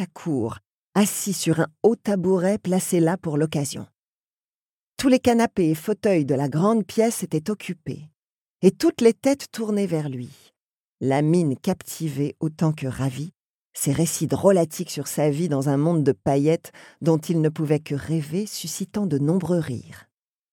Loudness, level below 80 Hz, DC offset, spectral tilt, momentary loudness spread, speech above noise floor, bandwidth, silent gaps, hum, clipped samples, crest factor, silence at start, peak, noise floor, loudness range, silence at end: -23 LUFS; -60 dBFS; under 0.1%; -6 dB/octave; 10 LU; over 68 dB; 18.5 kHz; 0.73-0.93 s, 3.98-4.37 s, 4.44-4.92 s, 8.19-8.23 s, 8.29-8.54 s, 10.62-10.95 s, 13.40-13.71 s; none; under 0.1%; 18 dB; 0 s; -4 dBFS; under -90 dBFS; 3 LU; 0.5 s